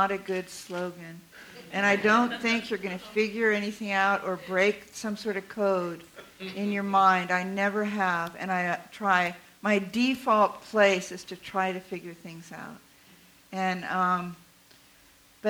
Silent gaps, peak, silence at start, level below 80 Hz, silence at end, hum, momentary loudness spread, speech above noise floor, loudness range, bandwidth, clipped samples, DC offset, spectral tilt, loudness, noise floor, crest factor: none; -8 dBFS; 0 s; -68 dBFS; 0 s; none; 18 LU; 30 dB; 6 LU; over 20 kHz; under 0.1%; under 0.1%; -4.5 dB/octave; -27 LUFS; -58 dBFS; 20 dB